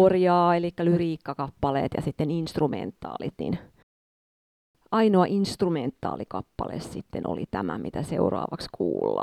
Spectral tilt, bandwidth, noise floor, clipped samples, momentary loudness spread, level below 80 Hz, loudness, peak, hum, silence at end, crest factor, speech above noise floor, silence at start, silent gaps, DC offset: -7.5 dB/octave; 13 kHz; under -90 dBFS; under 0.1%; 13 LU; -52 dBFS; -27 LUFS; -8 dBFS; none; 0 s; 18 dB; over 64 dB; 0 s; 3.83-4.74 s; under 0.1%